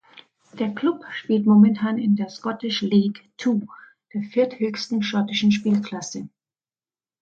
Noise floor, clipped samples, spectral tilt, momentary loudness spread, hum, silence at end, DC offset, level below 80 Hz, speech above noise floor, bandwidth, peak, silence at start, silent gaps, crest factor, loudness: under -90 dBFS; under 0.1%; -6 dB/octave; 14 LU; none; 0.95 s; under 0.1%; -68 dBFS; over 69 dB; 7.4 kHz; -6 dBFS; 0.55 s; none; 18 dB; -22 LUFS